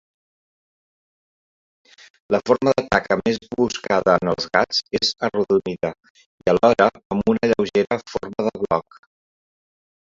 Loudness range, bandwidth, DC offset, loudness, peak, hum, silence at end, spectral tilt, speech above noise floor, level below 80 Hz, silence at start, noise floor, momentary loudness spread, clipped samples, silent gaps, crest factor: 4 LU; 7.8 kHz; under 0.1%; -20 LUFS; 0 dBFS; none; 1.25 s; -5 dB/octave; over 70 dB; -52 dBFS; 2.3 s; under -90 dBFS; 8 LU; under 0.1%; 6.10-6.15 s, 6.26-6.38 s, 7.05-7.10 s; 22 dB